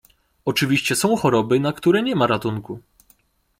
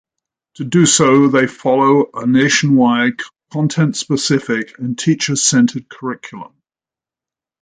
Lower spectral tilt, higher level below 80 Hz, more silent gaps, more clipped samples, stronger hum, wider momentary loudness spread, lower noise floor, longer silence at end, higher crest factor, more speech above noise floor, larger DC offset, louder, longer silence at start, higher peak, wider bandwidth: about the same, -5 dB/octave vs -4.5 dB/octave; about the same, -56 dBFS vs -58 dBFS; neither; neither; neither; second, 12 LU vs 15 LU; second, -60 dBFS vs under -90 dBFS; second, 0.8 s vs 1.2 s; about the same, 16 dB vs 16 dB; second, 40 dB vs over 76 dB; neither; second, -20 LUFS vs -14 LUFS; second, 0.45 s vs 0.6 s; second, -4 dBFS vs 0 dBFS; first, 16.5 kHz vs 9.6 kHz